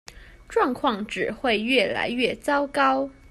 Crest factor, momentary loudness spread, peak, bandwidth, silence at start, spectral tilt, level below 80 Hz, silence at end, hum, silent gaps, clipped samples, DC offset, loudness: 18 dB; 6 LU; -6 dBFS; 13.5 kHz; 0.1 s; -4 dB/octave; -52 dBFS; 0.2 s; none; none; under 0.1%; under 0.1%; -23 LUFS